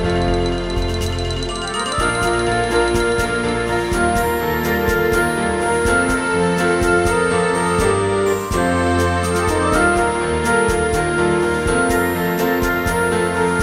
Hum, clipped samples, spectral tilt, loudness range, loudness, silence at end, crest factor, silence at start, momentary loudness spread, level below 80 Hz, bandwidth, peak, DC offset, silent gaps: none; under 0.1%; -5 dB/octave; 2 LU; -17 LUFS; 0 s; 14 dB; 0 s; 4 LU; -30 dBFS; 16 kHz; -2 dBFS; under 0.1%; none